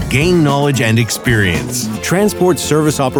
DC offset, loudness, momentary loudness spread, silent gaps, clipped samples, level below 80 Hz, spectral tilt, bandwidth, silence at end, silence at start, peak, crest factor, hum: under 0.1%; -13 LUFS; 5 LU; none; under 0.1%; -34 dBFS; -5 dB/octave; over 20 kHz; 0 s; 0 s; -2 dBFS; 12 dB; none